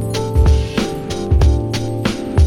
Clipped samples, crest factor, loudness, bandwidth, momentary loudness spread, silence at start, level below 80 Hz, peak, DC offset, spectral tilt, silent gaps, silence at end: under 0.1%; 12 dB; -17 LUFS; 13 kHz; 6 LU; 0 s; -18 dBFS; -2 dBFS; under 0.1%; -6.5 dB/octave; none; 0 s